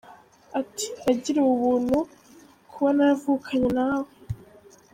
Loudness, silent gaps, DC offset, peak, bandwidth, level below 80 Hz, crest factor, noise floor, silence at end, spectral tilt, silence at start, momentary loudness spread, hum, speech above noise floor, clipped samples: -24 LUFS; none; under 0.1%; -10 dBFS; 15.5 kHz; -54 dBFS; 16 dB; -53 dBFS; 0.6 s; -5.5 dB/octave; 0.1 s; 15 LU; none; 30 dB; under 0.1%